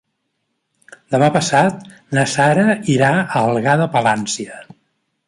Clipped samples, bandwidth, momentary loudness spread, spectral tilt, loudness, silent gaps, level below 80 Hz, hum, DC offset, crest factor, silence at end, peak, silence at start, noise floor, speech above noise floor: under 0.1%; 11.5 kHz; 9 LU; -5 dB/octave; -16 LUFS; none; -56 dBFS; none; under 0.1%; 16 dB; 0.65 s; -2 dBFS; 1.1 s; -71 dBFS; 56 dB